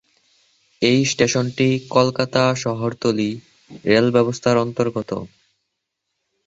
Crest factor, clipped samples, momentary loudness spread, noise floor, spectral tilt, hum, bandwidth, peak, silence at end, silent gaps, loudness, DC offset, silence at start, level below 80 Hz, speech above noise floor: 20 dB; under 0.1%; 10 LU; -77 dBFS; -5 dB/octave; none; 8 kHz; 0 dBFS; 1.2 s; none; -19 LUFS; under 0.1%; 0.8 s; -56 dBFS; 59 dB